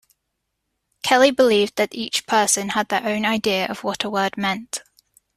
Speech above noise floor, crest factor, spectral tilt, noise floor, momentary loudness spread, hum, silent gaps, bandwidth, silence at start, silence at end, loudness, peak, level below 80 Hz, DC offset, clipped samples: 57 dB; 20 dB; -2.5 dB/octave; -77 dBFS; 9 LU; none; none; 14.5 kHz; 1.05 s; 0.55 s; -20 LUFS; -2 dBFS; -62 dBFS; under 0.1%; under 0.1%